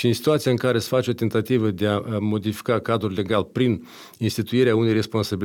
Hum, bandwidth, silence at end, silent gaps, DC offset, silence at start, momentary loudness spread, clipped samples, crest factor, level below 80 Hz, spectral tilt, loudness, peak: none; 17.5 kHz; 0 s; none; under 0.1%; 0 s; 6 LU; under 0.1%; 14 dB; -58 dBFS; -6.5 dB/octave; -22 LUFS; -8 dBFS